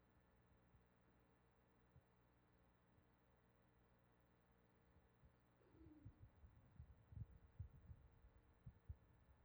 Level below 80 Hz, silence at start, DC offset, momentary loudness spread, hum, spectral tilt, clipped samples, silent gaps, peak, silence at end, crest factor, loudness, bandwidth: -72 dBFS; 0 s; under 0.1%; 7 LU; 60 Hz at -80 dBFS; -7.5 dB/octave; under 0.1%; none; -44 dBFS; 0 s; 24 dB; -65 LUFS; over 20 kHz